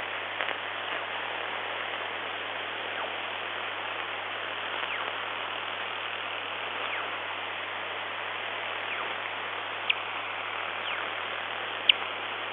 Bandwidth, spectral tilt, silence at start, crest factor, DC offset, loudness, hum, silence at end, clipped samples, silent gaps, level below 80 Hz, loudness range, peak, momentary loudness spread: 5.2 kHz; -5 dB/octave; 0 s; 30 dB; under 0.1%; -31 LUFS; none; 0 s; under 0.1%; none; -84 dBFS; 3 LU; -4 dBFS; 5 LU